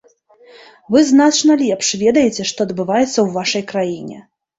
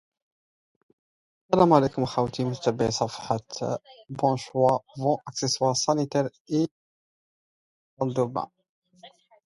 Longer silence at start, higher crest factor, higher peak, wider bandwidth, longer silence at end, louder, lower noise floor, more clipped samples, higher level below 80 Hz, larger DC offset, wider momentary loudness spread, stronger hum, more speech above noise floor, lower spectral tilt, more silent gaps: second, 0.9 s vs 1.5 s; second, 14 dB vs 22 dB; about the same, -2 dBFS vs -4 dBFS; second, 8 kHz vs 11.5 kHz; about the same, 0.4 s vs 0.4 s; first, -15 LUFS vs -26 LUFS; second, -48 dBFS vs -53 dBFS; neither; about the same, -56 dBFS vs -60 dBFS; neither; about the same, 10 LU vs 10 LU; neither; first, 33 dB vs 28 dB; second, -3.5 dB/octave vs -5.5 dB/octave; second, none vs 6.40-6.45 s, 6.71-7.97 s, 8.69-8.82 s